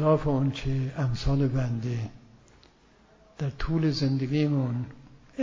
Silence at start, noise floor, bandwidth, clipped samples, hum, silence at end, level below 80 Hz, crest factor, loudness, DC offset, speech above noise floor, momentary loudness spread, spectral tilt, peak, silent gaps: 0 s; -59 dBFS; 7.6 kHz; under 0.1%; none; 0 s; -42 dBFS; 16 dB; -28 LUFS; under 0.1%; 32 dB; 9 LU; -8 dB/octave; -10 dBFS; none